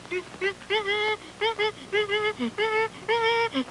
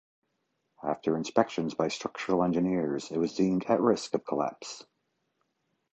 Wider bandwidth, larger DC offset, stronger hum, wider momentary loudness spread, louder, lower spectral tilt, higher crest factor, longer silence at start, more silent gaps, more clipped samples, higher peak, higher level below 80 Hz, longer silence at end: first, 11.5 kHz vs 8.8 kHz; neither; neither; second, 5 LU vs 9 LU; first, -26 LUFS vs -29 LUFS; second, -3.5 dB/octave vs -6 dB/octave; second, 16 dB vs 22 dB; second, 0 s vs 0.8 s; neither; neither; second, -12 dBFS vs -8 dBFS; about the same, -62 dBFS vs -66 dBFS; second, 0 s vs 1.1 s